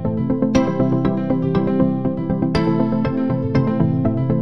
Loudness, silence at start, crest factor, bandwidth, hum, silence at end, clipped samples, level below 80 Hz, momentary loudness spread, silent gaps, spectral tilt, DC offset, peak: -19 LUFS; 0 s; 16 dB; 9.8 kHz; none; 0 s; under 0.1%; -38 dBFS; 3 LU; none; -8.5 dB/octave; 1%; -2 dBFS